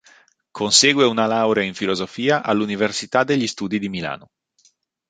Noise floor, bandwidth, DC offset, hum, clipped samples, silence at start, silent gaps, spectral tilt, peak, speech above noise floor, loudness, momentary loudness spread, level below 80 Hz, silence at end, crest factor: -61 dBFS; 9.6 kHz; under 0.1%; none; under 0.1%; 0.55 s; none; -3 dB/octave; -2 dBFS; 41 dB; -19 LUFS; 13 LU; -60 dBFS; 0.9 s; 20 dB